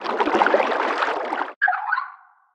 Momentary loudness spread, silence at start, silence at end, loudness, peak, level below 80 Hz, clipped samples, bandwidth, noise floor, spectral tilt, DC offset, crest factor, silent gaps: 8 LU; 0 s; 0.4 s; -21 LUFS; -2 dBFS; -66 dBFS; under 0.1%; 10 kHz; -44 dBFS; -3.5 dB/octave; under 0.1%; 20 dB; 1.56-1.61 s